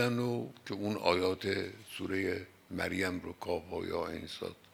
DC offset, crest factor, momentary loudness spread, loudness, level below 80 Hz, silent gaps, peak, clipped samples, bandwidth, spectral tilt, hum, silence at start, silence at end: under 0.1%; 22 dB; 11 LU; -36 LUFS; -70 dBFS; none; -12 dBFS; under 0.1%; 19.5 kHz; -5.5 dB/octave; none; 0 s; 0.2 s